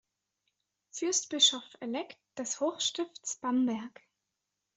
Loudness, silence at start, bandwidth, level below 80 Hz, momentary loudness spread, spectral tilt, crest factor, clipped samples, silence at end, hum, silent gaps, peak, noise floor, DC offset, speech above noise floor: -31 LUFS; 0.95 s; 8.2 kHz; -82 dBFS; 16 LU; -1 dB/octave; 24 dB; under 0.1%; 0.9 s; none; none; -12 dBFS; -86 dBFS; under 0.1%; 53 dB